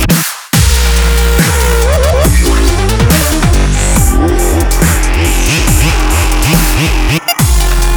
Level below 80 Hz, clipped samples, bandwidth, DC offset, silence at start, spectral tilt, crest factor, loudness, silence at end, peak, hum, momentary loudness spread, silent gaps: -10 dBFS; under 0.1%; over 20 kHz; under 0.1%; 0 s; -4 dB/octave; 8 dB; -10 LUFS; 0 s; 0 dBFS; none; 2 LU; none